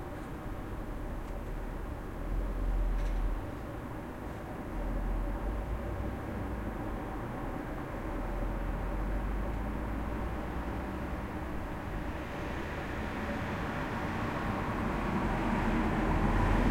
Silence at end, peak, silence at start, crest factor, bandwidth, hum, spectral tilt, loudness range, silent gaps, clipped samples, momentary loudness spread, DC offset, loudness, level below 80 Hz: 0 s; -16 dBFS; 0 s; 18 dB; 16 kHz; none; -7 dB/octave; 5 LU; none; under 0.1%; 10 LU; under 0.1%; -36 LUFS; -38 dBFS